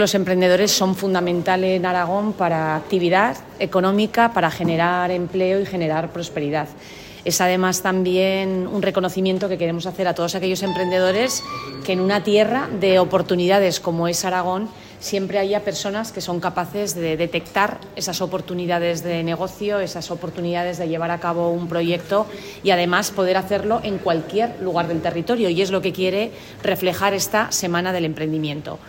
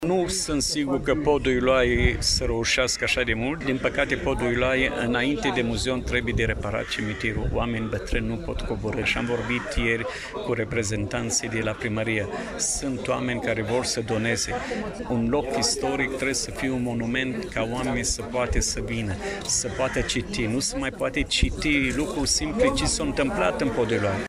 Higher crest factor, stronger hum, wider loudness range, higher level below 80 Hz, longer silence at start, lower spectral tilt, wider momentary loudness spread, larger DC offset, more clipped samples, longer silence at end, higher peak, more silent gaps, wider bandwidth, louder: about the same, 16 dB vs 20 dB; neither; about the same, 4 LU vs 4 LU; second, -54 dBFS vs -36 dBFS; about the same, 0 s vs 0 s; about the same, -4.5 dB/octave vs -4 dB/octave; about the same, 8 LU vs 6 LU; neither; neither; about the same, 0 s vs 0 s; about the same, -4 dBFS vs -6 dBFS; neither; about the same, 16.5 kHz vs 15 kHz; first, -20 LUFS vs -25 LUFS